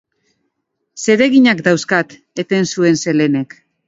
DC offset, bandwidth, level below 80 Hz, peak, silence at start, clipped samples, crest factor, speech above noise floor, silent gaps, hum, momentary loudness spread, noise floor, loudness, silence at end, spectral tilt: under 0.1%; 8 kHz; -60 dBFS; 0 dBFS; 0.95 s; under 0.1%; 16 dB; 58 dB; none; none; 12 LU; -72 dBFS; -14 LUFS; 0.4 s; -5 dB/octave